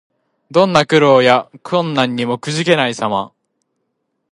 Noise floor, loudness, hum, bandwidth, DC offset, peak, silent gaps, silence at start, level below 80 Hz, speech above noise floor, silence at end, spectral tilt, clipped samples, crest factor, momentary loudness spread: -71 dBFS; -14 LUFS; none; 11.5 kHz; under 0.1%; 0 dBFS; none; 0.5 s; -60 dBFS; 57 dB; 1.05 s; -5 dB/octave; under 0.1%; 16 dB; 10 LU